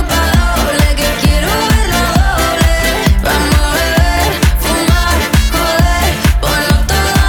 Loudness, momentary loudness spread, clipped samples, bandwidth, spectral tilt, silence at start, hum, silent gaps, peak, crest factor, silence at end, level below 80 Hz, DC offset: -12 LUFS; 1 LU; under 0.1%; over 20 kHz; -4.5 dB/octave; 0 s; none; none; 0 dBFS; 10 dB; 0 s; -14 dBFS; under 0.1%